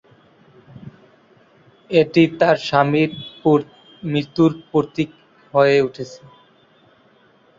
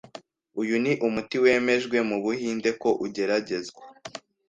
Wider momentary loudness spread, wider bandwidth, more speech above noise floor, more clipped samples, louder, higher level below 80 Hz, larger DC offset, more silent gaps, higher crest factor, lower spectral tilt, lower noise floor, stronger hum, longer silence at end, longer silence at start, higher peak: second, 12 LU vs 19 LU; second, 7.6 kHz vs 9.2 kHz; first, 37 dB vs 23 dB; neither; first, -18 LUFS vs -25 LUFS; first, -60 dBFS vs -66 dBFS; neither; neither; about the same, 18 dB vs 18 dB; first, -7 dB/octave vs -5 dB/octave; first, -54 dBFS vs -48 dBFS; neither; first, 1.45 s vs 0.3 s; first, 0.85 s vs 0.15 s; first, -2 dBFS vs -8 dBFS